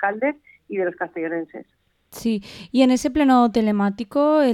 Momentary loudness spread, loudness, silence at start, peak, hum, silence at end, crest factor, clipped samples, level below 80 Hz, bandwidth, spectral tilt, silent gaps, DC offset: 13 LU; -21 LUFS; 0 s; -4 dBFS; none; 0 s; 16 dB; under 0.1%; -52 dBFS; 14 kHz; -5.5 dB/octave; none; under 0.1%